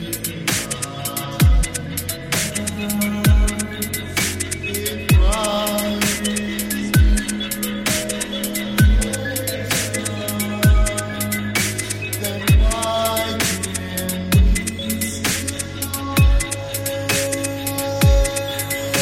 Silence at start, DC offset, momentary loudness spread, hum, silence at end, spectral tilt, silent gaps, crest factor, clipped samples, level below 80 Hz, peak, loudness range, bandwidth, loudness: 0 s; under 0.1%; 7 LU; none; 0 s; -4 dB/octave; none; 16 dB; under 0.1%; -24 dBFS; -4 dBFS; 1 LU; 16.5 kHz; -20 LUFS